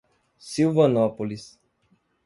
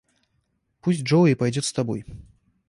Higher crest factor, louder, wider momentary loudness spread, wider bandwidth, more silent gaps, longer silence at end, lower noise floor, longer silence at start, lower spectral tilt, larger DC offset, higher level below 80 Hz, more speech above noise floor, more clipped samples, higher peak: about the same, 18 dB vs 16 dB; about the same, -23 LUFS vs -23 LUFS; about the same, 14 LU vs 13 LU; about the same, 11.5 kHz vs 11.5 kHz; neither; first, 0.8 s vs 0.5 s; second, -67 dBFS vs -71 dBFS; second, 0.45 s vs 0.85 s; about the same, -7 dB/octave vs -6 dB/octave; neither; second, -64 dBFS vs -54 dBFS; second, 44 dB vs 50 dB; neither; about the same, -6 dBFS vs -8 dBFS